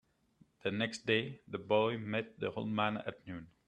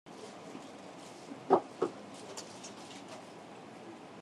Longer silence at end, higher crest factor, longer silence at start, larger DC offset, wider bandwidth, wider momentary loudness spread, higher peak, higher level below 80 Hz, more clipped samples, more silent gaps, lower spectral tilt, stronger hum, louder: first, 0.2 s vs 0 s; second, 22 dB vs 28 dB; first, 0.65 s vs 0.05 s; neither; second, 10.5 kHz vs 12.5 kHz; second, 12 LU vs 19 LU; second, -16 dBFS vs -12 dBFS; first, -74 dBFS vs -86 dBFS; neither; neither; about the same, -5.5 dB/octave vs -4.5 dB/octave; neither; first, -36 LUFS vs -39 LUFS